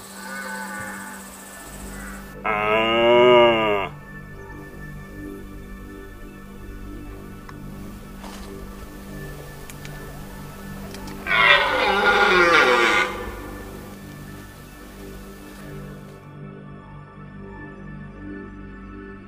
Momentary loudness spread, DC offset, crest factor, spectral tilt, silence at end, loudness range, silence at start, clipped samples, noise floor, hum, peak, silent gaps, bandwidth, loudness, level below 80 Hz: 25 LU; under 0.1%; 24 dB; -4 dB/octave; 0 s; 21 LU; 0 s; under 0.1%; -41 dBFS; none; 0 dBFS; none; 16 kHz; -18 LUFS; -44 dBFS